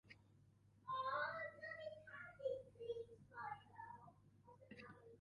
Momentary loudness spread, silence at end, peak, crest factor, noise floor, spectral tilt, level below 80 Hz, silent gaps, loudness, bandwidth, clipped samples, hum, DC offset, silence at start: 20 LU; 0 s; -34 dBFS; 18 dB; -72 dBFS; -5.5 dB/octave; -82 dBFS; none; -50 LUFS; 11 kHz; under 0.1%; 50 Hz at -70 dBFS; under 0.1%; 0.05 s